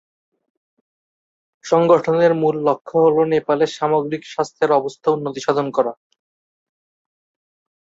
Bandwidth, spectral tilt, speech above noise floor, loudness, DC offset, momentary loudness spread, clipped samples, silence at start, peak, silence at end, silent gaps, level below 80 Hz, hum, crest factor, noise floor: 7.8 kHz; -6 dB/octave; over 73 dB; -18 LUFS; under 0.1%; 8 LU; under 0.1%; 1.65 s; -2 dBFS; 2 s; 2.81-2.85 s; -64 dBFS; none; 18 dB; under -90 dBFS